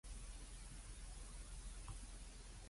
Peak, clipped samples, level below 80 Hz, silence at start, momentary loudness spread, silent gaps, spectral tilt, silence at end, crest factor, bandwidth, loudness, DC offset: -40 dBFS; under 0.1%; -54 dBFS; 0.05 s; 2 LU; none; -3 dB/octave; 0 s; 12 dB; 11.5 kHz; -56 LUFS; under 0.1%